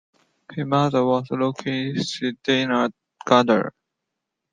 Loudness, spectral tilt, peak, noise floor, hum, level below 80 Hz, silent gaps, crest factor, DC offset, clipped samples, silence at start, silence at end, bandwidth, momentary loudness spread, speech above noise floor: -22 LUFS; -5.5 dB/octave; 0 dBFS; -82 dBFS; none; -64 dBFS; none; 22 dB; under 0.1%; under 0.1%; 0.5 s; 0.85 s; 9.4 kHz; 11 LU; 61 dB